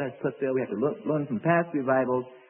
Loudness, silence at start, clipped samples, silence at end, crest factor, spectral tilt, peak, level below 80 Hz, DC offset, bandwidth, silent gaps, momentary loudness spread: -27 LUFS; 0 s; under 0.1%; 0.1 s; 16 dB; -12 dB/octave; -10 dBFS; -72 dBFS; under 0.1%; 3.3 kHz; none; 5 LU